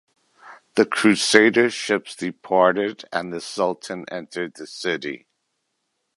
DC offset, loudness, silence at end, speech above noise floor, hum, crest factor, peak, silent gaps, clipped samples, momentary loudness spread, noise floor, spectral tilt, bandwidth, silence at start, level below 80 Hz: under 0.1%; -21 LUFS; 1 s; 54 dB; none; 22 dB; 0 dBFS; none; under 0.1%; 16 LU; -75 dBFS; -3.5 dB/octave; 11.5 kHz; 0.45 s; -68 dBFS